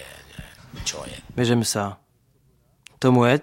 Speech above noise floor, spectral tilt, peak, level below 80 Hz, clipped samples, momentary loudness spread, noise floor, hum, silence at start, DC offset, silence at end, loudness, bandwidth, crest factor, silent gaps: 41 dB; -5 dB/octave; -4 dBFS; -50 dBFS; under 0.1%; 23 LU; -62 dBFS; none; 0 s; under 0.1%; 0 s; -23 LUFS; 16.5 kHz; 20 dB; none